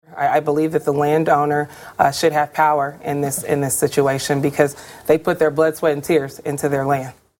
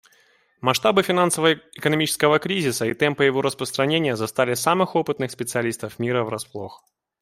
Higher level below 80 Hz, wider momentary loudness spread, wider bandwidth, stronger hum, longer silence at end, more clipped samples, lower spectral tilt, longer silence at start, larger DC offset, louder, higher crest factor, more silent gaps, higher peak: first, -56 dBFS vs -62 dBFS; second, 6 LU vs 9 LU; about the same, 17 kHz vs 16 kHz; neither; second, 0.3 s vs 0.45 s; neither; about the same, -5 dB/octave vs -4 dB/octave; second, 0.1 s vs 0.65 s; neither; first, -18 LUFS vs -21 LUFS; about the same, 18 dB vs 20 dB; neither; first, 0 dBFS vs -4 dBFS